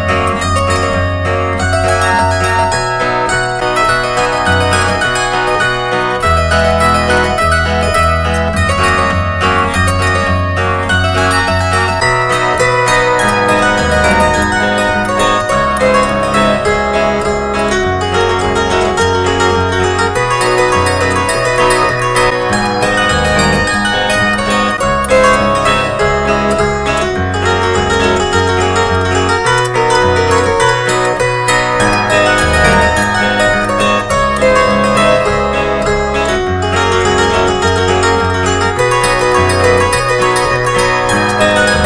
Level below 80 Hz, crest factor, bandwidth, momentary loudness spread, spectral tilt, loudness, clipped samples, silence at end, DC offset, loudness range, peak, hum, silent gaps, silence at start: -26 dBFS; 12 dB; 10.5 kHz; 3 LU; -4.5 dB/octave; -11 LUFS; under 0.1%; 0 s; under 0.1%; 2 LU; 0 dBFS; none; none; 0 s